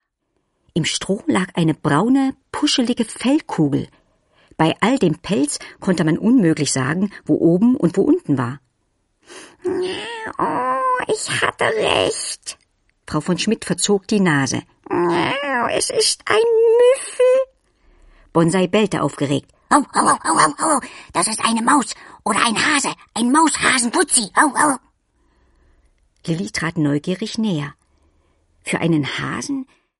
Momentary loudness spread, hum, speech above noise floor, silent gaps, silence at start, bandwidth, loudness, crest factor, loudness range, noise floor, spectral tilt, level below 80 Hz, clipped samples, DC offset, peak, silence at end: 10 LU; none; 53 dB; none; 0.75 s; 11.5 kHz; -18 LUFS; 18 dB; 6 LU; -71 dBFS; -4 dB/octave; -54 dBFS; under 0.1%; under 0.1%; 0 dBFS; 0.35 s